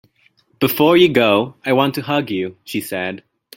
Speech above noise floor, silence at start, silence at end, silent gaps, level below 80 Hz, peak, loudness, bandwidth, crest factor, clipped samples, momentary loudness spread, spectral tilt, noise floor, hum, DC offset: 42 dB; 0.6 s; 0.4 s; none; -58 dBFS; -2 dBFS; -17 LUFS; 16.5 kHz; 16 dB; under 0.1%; 13 LU; -5.5 dB/octave; -58 dBFS; none; under 0.1%